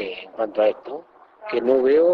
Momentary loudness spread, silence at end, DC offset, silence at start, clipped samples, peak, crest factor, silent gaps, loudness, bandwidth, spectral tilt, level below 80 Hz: 19 LU; 0 s; under 0.1%; 0 s; under 0.1%; -6 dBFS; 14 dB; none; -21 LUFS; 5.2 kHz; -7 dB/octave; -66 dBFS